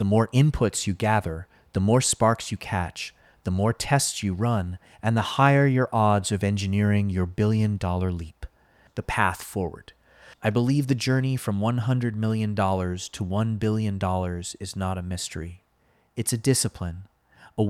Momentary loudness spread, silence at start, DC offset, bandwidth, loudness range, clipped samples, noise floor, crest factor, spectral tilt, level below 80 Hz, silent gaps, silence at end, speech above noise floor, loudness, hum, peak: 14 LU; 0 s; under 0.1%; 15 kHz; 6 LU; under 0.1%; -65 dBFS; 20 dB; -5.5 dB/octave; -46 dBFS; none; 0 s; 41 dB; -25 LUFS; none; -4 dBFS